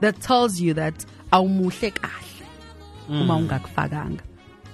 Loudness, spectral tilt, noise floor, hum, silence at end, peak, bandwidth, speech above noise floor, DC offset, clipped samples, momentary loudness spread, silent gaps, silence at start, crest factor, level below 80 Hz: -23 LUFS; -5.5 dB/octave; -43 dBFS; none; 0 s; -4 dBFS; 13 kHz; 20 dB; under 0.1%; under 0.1%; 23 LU; none; 0 s; 20 dB; -48 dBFS